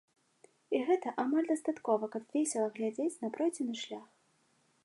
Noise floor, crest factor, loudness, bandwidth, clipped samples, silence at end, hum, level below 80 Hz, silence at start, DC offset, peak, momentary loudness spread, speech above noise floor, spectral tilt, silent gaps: -72 dBFS; 18 dB; -34 LUFS; 11.5 kHz; under 0.1%; 0.8 s; none; -90 dBFS; 0.7 s; under 0.1%; -18 dBFS; 7 LU; 39 dB; -4 dB/octave; none